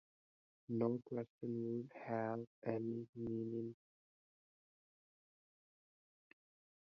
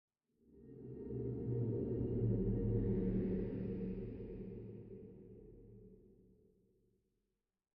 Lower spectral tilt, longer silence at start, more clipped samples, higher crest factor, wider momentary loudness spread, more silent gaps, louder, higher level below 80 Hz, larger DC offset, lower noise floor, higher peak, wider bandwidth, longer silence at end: second, -9 dB/octave vs -12.5 dB/octave; first, 0.7 s vs 0.5 s; neither; first, 22 dB vs 16 dB; second, 7 LU vs 22 LU; first, 1.30-1.39 s, 2.47-2.62 s, 3.09-3.13 s vs none; second, -44 LUFS vs -41 LUFS; second, -80 dBFS vs -52 dBFS; neither; about the same, under -90 dBFS vs -90 dBFS; about the same, -24 dBFS vs -26 dBFS; first, 5.8 kHz vs 3 kHz; first, 3.1 s vs 1.75 s